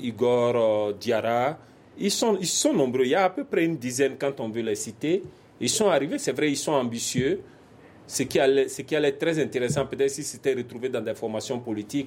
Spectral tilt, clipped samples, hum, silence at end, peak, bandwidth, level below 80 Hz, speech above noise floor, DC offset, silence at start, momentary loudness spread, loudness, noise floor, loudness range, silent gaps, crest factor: -4 dB/octave; under 0.1%; none; 0 s; -8 dBFS; 16.5 kHz; -62 dBFS; 26 dB; under 0.1%; 0 s; 8 LU; -25 LUFS; -50 dBFS; 2 LU; none; 18 dB